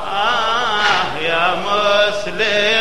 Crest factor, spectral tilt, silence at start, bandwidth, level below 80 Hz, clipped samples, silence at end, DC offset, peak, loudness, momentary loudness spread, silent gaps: 14 dB; -2.5 dB/octave; 0 s; 13 kHz; -46 dBFS; under 0.1%; 0 s; 4%; -2 dBFS; -16 LUFS; 4 LU; none